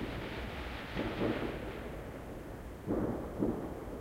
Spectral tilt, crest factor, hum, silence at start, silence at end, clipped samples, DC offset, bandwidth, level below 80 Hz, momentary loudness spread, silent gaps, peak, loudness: -7 dB/octave; 20 dB; none; 0 s; 0 s; under 0.1%; under 0.1%; 16 kHz; -48 dBFS; 10 LU; none; -20 dBFS; -39 LUFS